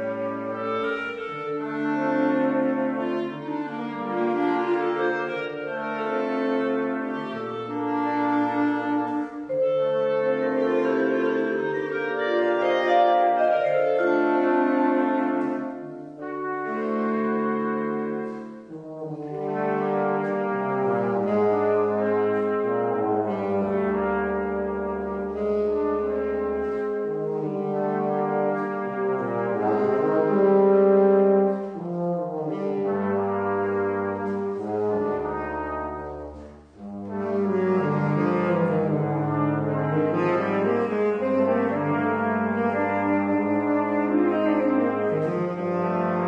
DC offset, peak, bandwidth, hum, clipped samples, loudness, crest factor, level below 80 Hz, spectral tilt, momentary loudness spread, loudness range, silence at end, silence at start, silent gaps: under 0.1%; -8 dBFS; 6.6 kHz; none; under 0.1%; -24 LUFS; 16 dB; -56 dBFS; -8.5 dB/octave; 9 LU; 6 LU; 0 s; 0 s; none